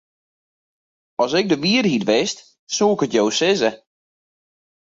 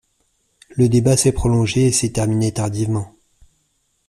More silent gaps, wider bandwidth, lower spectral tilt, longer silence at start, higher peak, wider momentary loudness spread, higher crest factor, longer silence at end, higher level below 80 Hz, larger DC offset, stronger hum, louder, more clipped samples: first, 2.59-2.67 s vs none; second, 7.8 kHz vs 14.5 kHz; second, -4 dB/octave vs -5.5 dB/octave; first, 1.2 s vs 0.75 s; about the same, -4 dBFS vs -4 dBFS; about the same, 9 LU vs 9 LU; about the same, 18 dB vs 16 dB; first, 1.15 s vs 1 s; second, -62 dBFS vs -38 dBFS; neither; neither; about the same, -19 LUFS vs -17 LUFS; neither